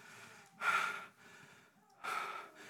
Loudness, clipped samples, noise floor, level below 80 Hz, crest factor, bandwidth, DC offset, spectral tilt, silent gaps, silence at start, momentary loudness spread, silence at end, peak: -39 LUFS; under 0.1%; -65 dBFS; under -90 dBFS; 20 dB; 18 kHz; under 0.1%; -1 dB/octave; none; 0 s; 24 LU; 0 s; -22 dBFS